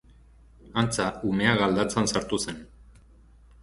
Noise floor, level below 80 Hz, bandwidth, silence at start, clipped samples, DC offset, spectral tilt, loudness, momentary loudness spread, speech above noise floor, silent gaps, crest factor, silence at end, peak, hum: -54 dBFS; -50 dBFS; 11.5 kHz; 0.65 s; under 0.1%; under 0.1%; -4.5 dB/octave; -26 LUFS; 10 LU; 28 dB; none; 22 dB; 0.95 s; -6 dBFS; none